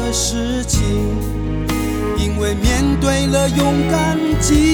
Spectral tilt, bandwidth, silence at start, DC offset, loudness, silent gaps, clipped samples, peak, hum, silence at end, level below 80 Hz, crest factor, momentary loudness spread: -5 dB/octave; over 20 kHz; 0 s; under 0.1%; -17 LUFS; none; under 0.1%; -4 dBFS; none; 0 s; -22 dBFS; 12 dB; 5 LU